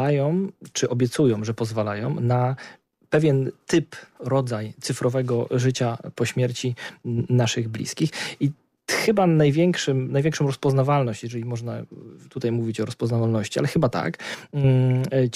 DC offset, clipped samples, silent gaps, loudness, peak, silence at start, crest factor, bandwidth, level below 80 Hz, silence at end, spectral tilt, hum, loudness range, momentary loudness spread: under 0.1%; under 0.1%; none; -23 LUFS; -10 dBFS; 0 s; 14 dB; 14 kHz; -58 dBFS; 0 s; -6 dB/octave; none; 3 LU; 10 LU